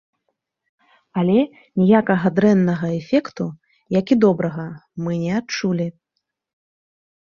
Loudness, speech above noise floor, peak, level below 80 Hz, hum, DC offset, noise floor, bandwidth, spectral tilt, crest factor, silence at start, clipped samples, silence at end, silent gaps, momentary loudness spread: -19 LUFS; 59 dB; -2 dBFS; -60 dBFS; none; under 0.1%; -77 dBFS; 7 kHz; -7.5 dB/octave; 18 dB; 1.15 s; under 0.1%; 1.3 s; none; 13 LU